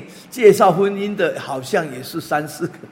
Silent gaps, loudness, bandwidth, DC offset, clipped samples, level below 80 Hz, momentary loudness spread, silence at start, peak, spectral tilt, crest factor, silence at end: none; -18 LUFS; 16.5 kHz; under 0.1%; under 0.1%; -62 dBFS; 15 LU; 0 s; 0 dBFS; -5.5 dB/octave; 18 dB; 0.05 s